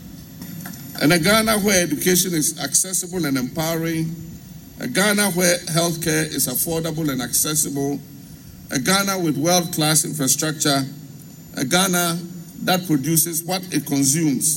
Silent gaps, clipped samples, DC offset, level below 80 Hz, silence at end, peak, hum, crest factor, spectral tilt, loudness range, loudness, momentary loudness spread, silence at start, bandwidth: none; under 0.1%; under 0.1%; -50 dBFS; 0 s; -4 dBFS; none; 18 dB; -3 dB/octave; 3 LU; -19 LUFS; 17 LU; 0 s; 16.5 kHz